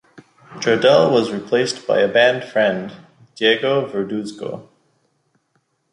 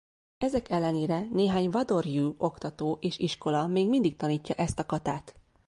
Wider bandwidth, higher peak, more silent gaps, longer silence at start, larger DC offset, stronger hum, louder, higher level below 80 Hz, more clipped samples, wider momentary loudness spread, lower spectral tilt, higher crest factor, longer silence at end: about the same, 11 kHz vs 11.5 kHz; first, -2 dBFS vs -14 dBFS; neither; about the same, 0.5 s vs 0.4 s; neither; neither; first, -17 LUFS vs -29 LUFS; second, -64 dBFS vs -56 dBFS; neither; first, 15 LU vs 6 LU; second, -4.5 dB/octave vs -6.5 dB/octave; about the same, 18 dB vs 16 dB; first, 1.3 s vs 0.35 s